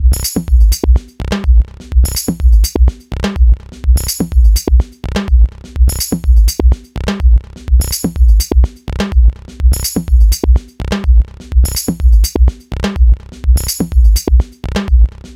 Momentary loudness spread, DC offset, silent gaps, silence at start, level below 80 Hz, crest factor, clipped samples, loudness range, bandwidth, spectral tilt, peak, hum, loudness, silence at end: 6 LU; under 0.1%; none; 0 s; -10 dBFS; 10 dB; under 0.1%; 1 LU; 16 kHz; -5.5 dB/octave; 0 dBFS; none; -13 LUFS; 0.05 s